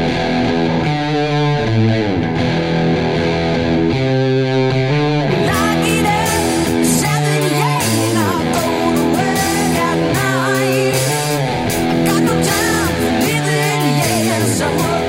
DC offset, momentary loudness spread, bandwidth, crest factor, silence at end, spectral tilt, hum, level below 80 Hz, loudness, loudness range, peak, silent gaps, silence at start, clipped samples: under 0.1%; 2 LU; 16.5 kHz; 12 dB; 0 s; -5 dB/octave; none; -36 dBFS; -15 LUFS; 1 LU; -2 dBFS; none; 0 s; under 0.1%